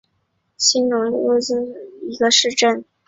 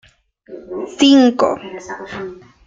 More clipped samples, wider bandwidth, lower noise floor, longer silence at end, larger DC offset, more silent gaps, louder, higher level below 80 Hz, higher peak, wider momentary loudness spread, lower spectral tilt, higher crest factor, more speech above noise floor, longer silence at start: neither; about the same, 8 kHz vs 7.6 kHz; first, -69 dBFS vs -45 dBFS; about the same, 0.25 s vs 0.35 s; neither; neither; second, -17 LUFS vs -13 LUFS; second, -64 dBFS vs -56 dBFS; about the same, -2 dBFS vs -2 dBFS; second, 14 LU vs 20 LU; second, -1 dB/octave vs -4 dB/octave; about the same, 18 dB vs 16 dB; first, 51 dB vs 30 dB; about the same, 0.6 s vs 0.5 s